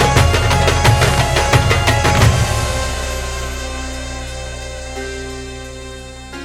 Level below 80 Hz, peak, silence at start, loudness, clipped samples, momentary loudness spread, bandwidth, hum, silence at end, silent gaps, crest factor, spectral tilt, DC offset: -24 dBFS; 0 dBFS; 0 s; -15 LUFS; under 0.1%; 17 LU; 17 kHz; none; 0 s; none; 16 dB; -4.5 dB/octave; under 0.1%